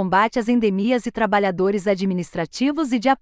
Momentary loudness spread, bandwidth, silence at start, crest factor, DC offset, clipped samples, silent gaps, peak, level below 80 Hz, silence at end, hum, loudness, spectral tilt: 4 LU; 9.4 kHz; 0 s; 14 dB; under 0.1%; under 0.1%; none; -6 dBFS; -52 dBFS; 0.05 s; none; -20 LUFS; -6 dB/octave